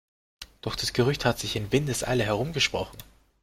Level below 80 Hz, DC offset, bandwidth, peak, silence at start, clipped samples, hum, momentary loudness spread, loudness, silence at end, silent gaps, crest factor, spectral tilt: -48 dBFS; under 0.1%; 16.5 kHz; -8 dBFS; 0.4 s; under 0.1%; none; 15 LU; -26 LUFS; 0.4 s; none; 20 dB; -4.5 dB/octave